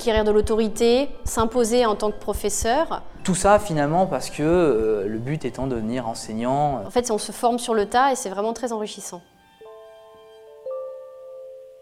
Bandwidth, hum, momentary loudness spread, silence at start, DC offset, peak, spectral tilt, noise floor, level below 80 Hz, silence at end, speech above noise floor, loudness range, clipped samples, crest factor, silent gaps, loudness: 16 kHz; none; 16 LU; 0 s; under 0.1%; -4 dBFS; -4.5 dB/octave; -46 dBFS; -40 dBFS; 0.05 s; 25 dB; 6 LU; under 0.1%; 20 dB; none; -22 LUFS